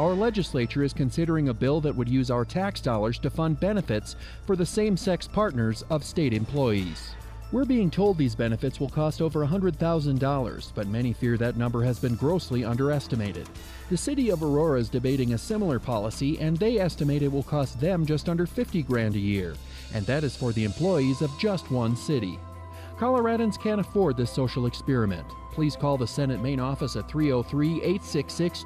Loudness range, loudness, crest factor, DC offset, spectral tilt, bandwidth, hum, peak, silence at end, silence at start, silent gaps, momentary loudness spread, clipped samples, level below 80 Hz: 1 LU; -26 LUFS; 12 dB; under 0.1%; -7 dB/octave; 15 kHz; none; -12 dBFS; 0 s; 0 s; none; 6 LU; under 0.1%; -42 dBFS